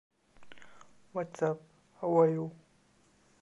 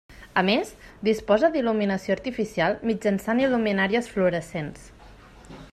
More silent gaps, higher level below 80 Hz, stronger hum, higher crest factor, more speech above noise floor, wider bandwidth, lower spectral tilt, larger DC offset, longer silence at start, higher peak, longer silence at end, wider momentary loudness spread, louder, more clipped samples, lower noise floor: neither; second, -76 dBFS vs -52 dBFS; neither; about the same, 22 dB vs 18 dB; first, 37 dB vs 24 dB; second, 8 kHz vs 14 kHz; first, -8.5 dB/octave vs -6 dB/octave; neither; first, 0.4 s vs 0.1 s; second, -14 dBFS vs -6 dBFS; first, 0.85 s vs 0.05 s; first, 15 LU vs 8 LU; second, -32 LUFS vs -24 LUFS; neither; first, -67 dBFS vs -48 dBFS